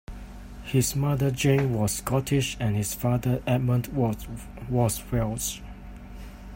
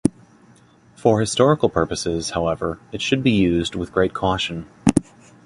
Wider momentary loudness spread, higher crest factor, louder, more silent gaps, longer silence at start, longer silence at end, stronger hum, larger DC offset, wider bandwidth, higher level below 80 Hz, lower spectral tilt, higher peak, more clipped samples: first, 20 LU vs 8 LU; about the same, 18 dB vs 20 dB; second, -26 LUFS vs -20 LUFS; neither; about the same, 0.1 s vs 0.05 s; second, 0 s vs 0.45 s; neither; neither; first, 16.5 kHz vs 11.5 kHz; about the same, -42 dBFS vs -42 dBFS; about the same, -5.5 dB/octave vs -5.5 dB/octave; second, -8 dBFS vs 0 dBFS; neither